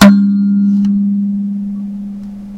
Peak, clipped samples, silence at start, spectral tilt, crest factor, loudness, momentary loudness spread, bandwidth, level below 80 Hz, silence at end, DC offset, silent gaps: 0 dBFS; 1%; 0 s; -6.5 dB/octave; 12 dB; -13 LUFS; 14 LU; 11 kHz; -46 dBFS; 0 s; under 0.1%; none